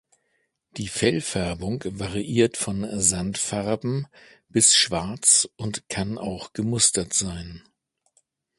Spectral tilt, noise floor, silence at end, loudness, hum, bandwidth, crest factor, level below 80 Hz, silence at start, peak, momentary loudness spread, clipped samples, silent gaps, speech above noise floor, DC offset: -3 dB/octave; -73 dBFS; 1 s; -22 LUFS; none; 12 kHz; 22 dB; -48 dBFS; 0.75 s; -2 dBFS; 15 LU; under 0.1%; none; 48 dB; under 0.1%